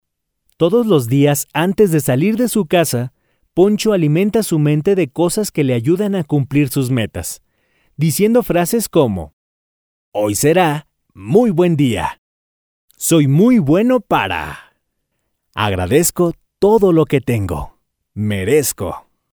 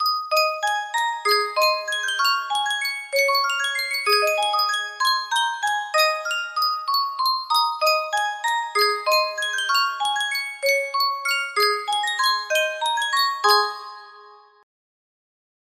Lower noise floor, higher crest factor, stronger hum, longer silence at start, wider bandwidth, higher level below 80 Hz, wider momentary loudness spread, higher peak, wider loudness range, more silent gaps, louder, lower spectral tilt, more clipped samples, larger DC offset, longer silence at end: first, -71 dBFS vs -48 dBFS; about the same, 16 dB vs 18 dB; neither; first, 0.6 s vs 0 s; first, over 20 kHz vs 16 kHz; first, -44 dBFS vs -76 dBFS; first, 13 LU vs 5 LU; first, 0 dBFS vs -6 dBFS; about the same, 2 LU vs 1 LU; first, 9.33-10.12 s, 12.18-12.88 s vs none; first, -15 LUFS vs -21 LUFS; first, -5.5 dB/octave vs 2.5 dB/octave; neither; neither; second, 0.35 s vs 1.25 s